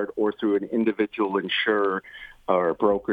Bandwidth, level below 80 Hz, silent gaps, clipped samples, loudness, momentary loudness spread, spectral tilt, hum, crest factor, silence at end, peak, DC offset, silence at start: 5 kHz; -60 dBFS; none; under 0.1%; -24 LUFS; 6 LU; -7 dB/octave; none; 18 dB; 0 s; -6 dBFS; under 0.1%; 0 s